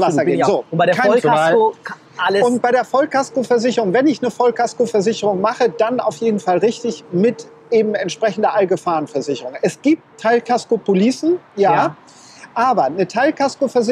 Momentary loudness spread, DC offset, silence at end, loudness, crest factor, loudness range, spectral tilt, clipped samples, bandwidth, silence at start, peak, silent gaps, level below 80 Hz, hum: 6 LU; under 0.1%; 0 s; -17 LUFS; 14 dB; 3 LU; -5.5 dB/octave; under 0.1%; 12 kHz; 0 s; -2 dBFS; none; -66 dBFS; none